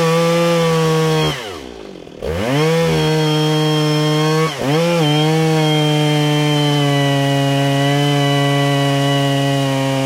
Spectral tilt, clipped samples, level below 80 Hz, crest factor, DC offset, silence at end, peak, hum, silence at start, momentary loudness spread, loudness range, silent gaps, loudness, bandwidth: -5.5 dB/octave; under 0.1%; -46 dBFS; 12 dB; under 0.1%; 0 s; -4 dBFS; none; 0 s; 5 LU; 2 LU; none; -15 LUFS; 16 kHz